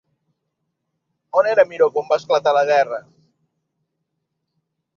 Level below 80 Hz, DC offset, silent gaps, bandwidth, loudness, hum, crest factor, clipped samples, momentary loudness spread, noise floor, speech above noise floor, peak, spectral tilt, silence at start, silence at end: -72 dBFS; under 0.1%; none; 7 kHz; -18 LUFS; none; 20 dB; under 0.1%; 6 LU; -76 dBFS; 59 dB; -2 dBFS; -3.5 dB/octave; 1.35 s; 1.95 s